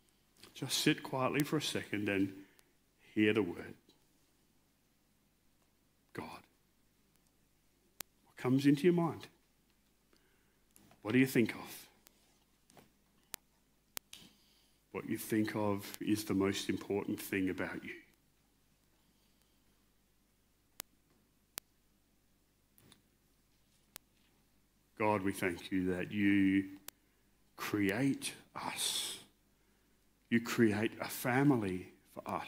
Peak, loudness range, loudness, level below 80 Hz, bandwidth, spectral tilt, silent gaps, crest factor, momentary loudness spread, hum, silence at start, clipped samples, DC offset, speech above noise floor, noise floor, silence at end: -12 dBFS; 20 LU; -35 LUFS; -76 dBFS; 16 kHz; -5 dB/octave; none; 26 dB; 20 LU; 50 Hz at -70 dBFS; 0.45 s; under 0.1%; under 0.1%; 40 dB; -74 dBFS; 0 s